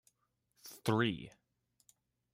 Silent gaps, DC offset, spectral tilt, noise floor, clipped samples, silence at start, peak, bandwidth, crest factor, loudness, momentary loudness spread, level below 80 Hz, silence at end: none; under 0.1%; -5.5 dB/octave; -80 dBFS; under 0.1%; 0.65 s; -18 dBFS; 16 kHz; 22 dB; -36 LUFS; 22 LU; -74 dBFS; 1.05 s